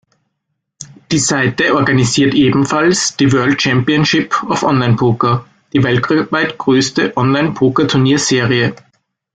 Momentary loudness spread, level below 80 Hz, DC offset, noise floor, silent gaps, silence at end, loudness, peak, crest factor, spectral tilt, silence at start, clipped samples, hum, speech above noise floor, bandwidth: 4 LU; -48 dBFS; under 0.1%; -72 dBFS; none; 0.6 s; -13 LUFS; -2 dBFS; 12 dB; -4.5 dB/octave; 0.8 s; under 0.1%; none; 60 dB; 9.4 kHz